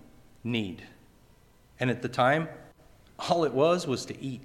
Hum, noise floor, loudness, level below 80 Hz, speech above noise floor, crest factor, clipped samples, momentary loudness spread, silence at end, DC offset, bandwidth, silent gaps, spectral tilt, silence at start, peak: none; -59 dBFS; -28 LUFS; -62 dBFS; 31 dB; 20 dB; under 0.1%; 15 LU; 0 s; under 0.1%; 16 kHz; none; -5.5 dB/octave; 0.45 s; -10 dBFS